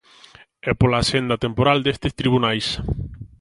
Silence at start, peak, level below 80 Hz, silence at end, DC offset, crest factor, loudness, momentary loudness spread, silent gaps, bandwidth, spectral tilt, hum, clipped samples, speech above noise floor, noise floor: 0.65 s; -2 dBFS; -36 dBFS; 0.15 s; under 0.1%; 20 dB; -20 LUFS; 11 LU; none; 11.5 kHz; -5.5 dB/octave; none; under 0.1%; 29 dB; -49 dBFS